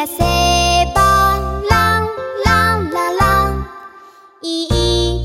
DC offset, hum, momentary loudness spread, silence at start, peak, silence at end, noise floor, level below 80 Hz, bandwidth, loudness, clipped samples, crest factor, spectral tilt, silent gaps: under 0.1%; none; 10 LU; 0 s; 0 dBFS; 0 s; -42 dBFS; -24 dBFS; 16.5 kHz; -14 LUFS; under 0.1%; 16 dB; -4 dB/octave; none